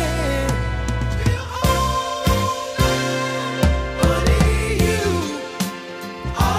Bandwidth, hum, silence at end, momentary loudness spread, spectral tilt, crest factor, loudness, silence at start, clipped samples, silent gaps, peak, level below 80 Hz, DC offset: 16 kHz; none; 0 s; 8 LU; -5 dB/octave; 16 dB; -20 LUFS; 0 s; under 0.1%; none; -4 dBFS; -26 dBFS; under 0.1%